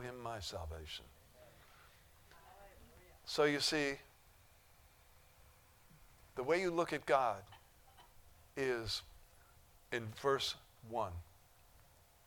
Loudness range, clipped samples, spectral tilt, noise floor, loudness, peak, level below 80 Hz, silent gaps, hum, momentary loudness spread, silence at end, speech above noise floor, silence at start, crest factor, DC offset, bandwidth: 4 LU; under 0.1%; -3.5 dB/octave; -66 dBFS; -39 LUFS; -18 dBFS; -64 dBFS; none; none; 23 LU; 1.05 s; 28 dB; 0 s; 24 dB; under 0.1%; 19 kHz